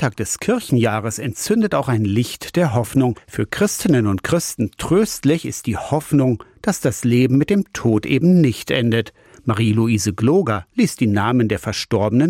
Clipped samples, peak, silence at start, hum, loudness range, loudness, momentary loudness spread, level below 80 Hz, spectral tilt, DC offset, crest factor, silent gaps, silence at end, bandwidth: under 0.1%; -6 dBFS; 0 s; none; 2 LU; -18 LUFS; 7 LU; -48 dBFS; -6 dB/octave; under 0.1%; 12 dB; none; 0 s; 16.5 kHz